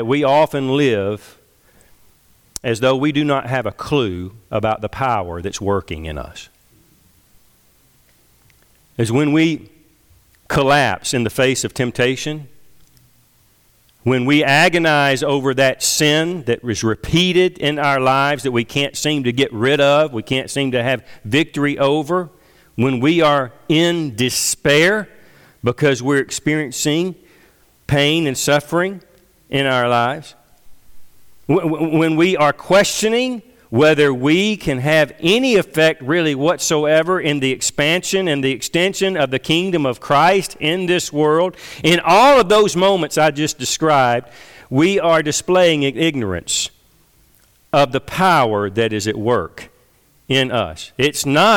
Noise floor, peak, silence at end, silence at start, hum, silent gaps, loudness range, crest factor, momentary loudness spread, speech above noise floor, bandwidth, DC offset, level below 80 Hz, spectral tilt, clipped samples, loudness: -55 dBFS; -4 dBFS; 0 s; 0 s; none; none; 7 LU; 14 dB; 9 LU; 39 dB; 19 kHz; under 0.1%; -46 dBFS; -4 dB/octave; under 0.1%; -16 LUFS